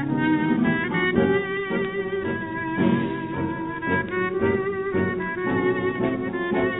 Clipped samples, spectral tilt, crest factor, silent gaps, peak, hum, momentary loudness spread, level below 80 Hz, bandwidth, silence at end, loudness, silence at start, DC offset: under 0.1%; -11.5 dB/octave; 18 dB; none; -6 dBFS; none; 6 LU; -50 dBFS; 4 kHz; 0 s; -24 LUFS; 0 s; under 0.1%